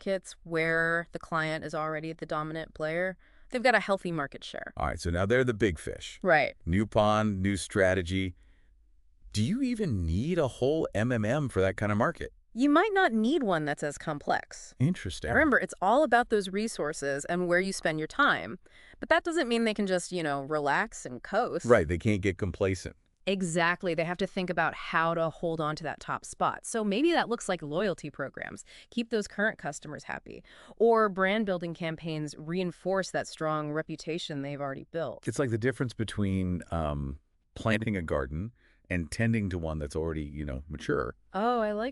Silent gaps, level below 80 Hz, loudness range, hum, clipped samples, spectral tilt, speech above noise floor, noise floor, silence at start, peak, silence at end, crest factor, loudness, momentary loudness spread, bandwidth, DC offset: none; -50 dBFS; 5 LU; none; under 0.1%; -5.5 dB/octave; 32 dB; -61 dBFS; 0 s; -8 dBFS; 0 s; 22 dB; -30 LUFS; 12 LU; 12 kHz; under 0.1%